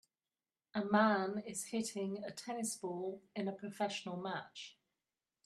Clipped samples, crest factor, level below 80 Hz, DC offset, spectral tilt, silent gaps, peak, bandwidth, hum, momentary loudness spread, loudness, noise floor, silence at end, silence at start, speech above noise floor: under 0.1%; 22 dB; -84 dBFS; under 0.1%; -4 dB/octave; none; -18 dBFS; 13.5 kHz; none; 13 LU; -39 LUFS; under -90 dBFS; 0.75 s; 0.75 s; over 51 dB